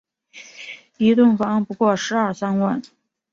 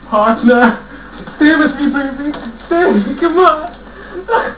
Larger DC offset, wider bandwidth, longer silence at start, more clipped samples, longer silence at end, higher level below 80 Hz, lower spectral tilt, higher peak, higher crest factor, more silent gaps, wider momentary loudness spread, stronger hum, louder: second, under 0.1% vs 0.5%; first, 7.6 kHz vs 4 kHz; first, 0.35 s vs 0.05 s; neither; first, 0.5 s vs 0 s; second, -62 dBFS vs -40 dBFS; second, -6 dB/octave vs -9.5 dB/octave; second, -6 dBFS vs 0 dBFS; about the same, 16 dB vs 12 dB; neither; about the same, 21 LU vs 19 LU; neither; second, -19 LUFS vs -12 LUFS